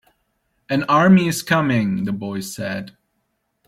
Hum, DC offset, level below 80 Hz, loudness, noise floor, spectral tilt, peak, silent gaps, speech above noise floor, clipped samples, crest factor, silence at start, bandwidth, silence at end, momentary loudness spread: none; under 0.1%; -58 dBFS; -19 LUFS; -71 dBFS; -6 dB/octave; -4 dBFS; none; 53 dB; under 0.1%; 16 dB; 0.7 s; 15.5 kHz; 0.8 s; 14 LU